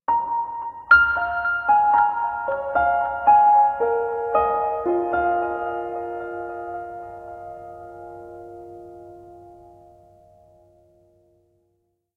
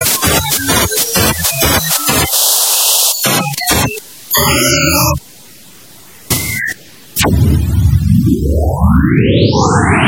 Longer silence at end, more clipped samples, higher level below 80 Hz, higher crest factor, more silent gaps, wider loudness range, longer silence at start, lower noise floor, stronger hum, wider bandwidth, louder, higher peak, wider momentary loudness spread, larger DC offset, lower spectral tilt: first, 2.65 s vs 0 s; neither; second, -52 dBFS vs -22 dBFS; first, 20 dB vs 12 dB; neither; first, 21 LU vs 5 LU; about the same, 0.1 s vs 0 s; first, -71 dBFS vs -38 dBFS; neither; second, 4.5 kHz vs 17.5 kHz; second, -20 LUFS vs -11 LUFS; second, -4 dBFS vs 0 dBFS; first, 24 LU vs 8 LU; second, under 0.1% vs 0.4%; first, -7 dB/octave vs -3.5 dB/octave